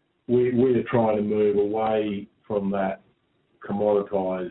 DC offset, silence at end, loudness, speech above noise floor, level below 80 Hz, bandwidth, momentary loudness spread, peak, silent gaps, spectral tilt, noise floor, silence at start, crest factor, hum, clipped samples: under 0.1%; 0 s; -24 LUFS; 44 dB; -58 dBFS; 4.1 kHz; 10 LU; -8 dBFS; none; -12 dB/octave; -67 dBFS; 0.3 s; 16 dB; none; under 0.1%